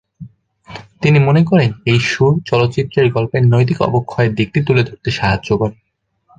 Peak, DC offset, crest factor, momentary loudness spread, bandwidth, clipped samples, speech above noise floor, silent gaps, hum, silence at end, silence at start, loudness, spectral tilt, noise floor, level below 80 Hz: -2 dBFS; under 0.1%; 14 dB; 7 LU; 7.8 kHz; under 0.1%; 44 dB; none; none; 0.65 s; 0.2 s; -14 LUFS; -7 dB/octave; -58 dBFS; -42 dBFS